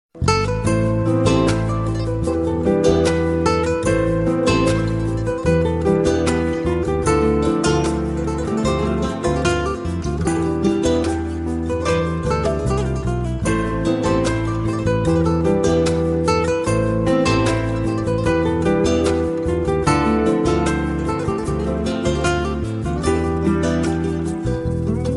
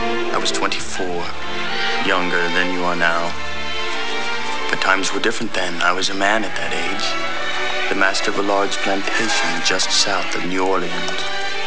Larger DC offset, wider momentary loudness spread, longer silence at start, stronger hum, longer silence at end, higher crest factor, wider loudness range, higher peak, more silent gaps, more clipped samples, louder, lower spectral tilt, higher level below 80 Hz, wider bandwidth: second, under 0.1% vs 9%; about the same, 5 LU vs 6 LU; first, 0.15 s vs 0 s; neither; about the same, 0 s vs 0 s; about the same, 16 dB vs 20 dB; about the same, 2 LU vs 2 LU; about the same, -2 dBFS vs -2 dBFS; neither; neither; about the same, -19 LUFS vs -19 LUFS; first, -6.5 dB/octave vs -2 dB/octave; first, -30 dBFS vs -50 dBFS; first, 11.5 kHz vs 8 kHz